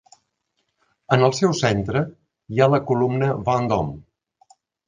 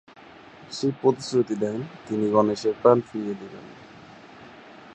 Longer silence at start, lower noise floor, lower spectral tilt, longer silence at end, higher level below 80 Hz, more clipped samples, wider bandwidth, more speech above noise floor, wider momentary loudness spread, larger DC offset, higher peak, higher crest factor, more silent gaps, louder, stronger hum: first, 1.1 s vs 0.6 s; first, -74 dBFS vs -47 dBFS; about the same, -6 dB/octave vs -6.5 dB/octave; first, 0.85 s vs 0 s; first, -50 dBFS vs -66 dBFS; neither; about the same, 9.8 kHz vs 9 kHz; first, 54 dB vs 23 dB; second, 10 LU vs 26 LU; neither; about the same, -2 dBFS vs -2 dBFS; about the same, 20 dB vs 24 dB; neither; first, -21 LUFS vs -24 LUFS; neither